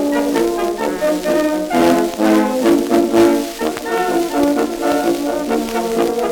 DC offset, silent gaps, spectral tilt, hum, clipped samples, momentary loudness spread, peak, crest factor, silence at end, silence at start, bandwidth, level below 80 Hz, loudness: under 0.1%; none; -4.5 dB/octave; none; under 0.1%; 5 LU; -2 dBFS; 14 dB; 0 s; 0 s; 19.5 kHz; -44 dBFS; -16 LUFS